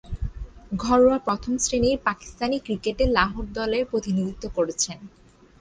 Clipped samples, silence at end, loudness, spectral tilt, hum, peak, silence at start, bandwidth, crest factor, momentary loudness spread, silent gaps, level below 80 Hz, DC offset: under 0.1%; 0.55 s; -24 LUFS; -4 dB/octave; none; -6 dBFS; 0.05 s; 10 kHz; 18 dB; 14 LU; none; -38 dBFS; under 0.1%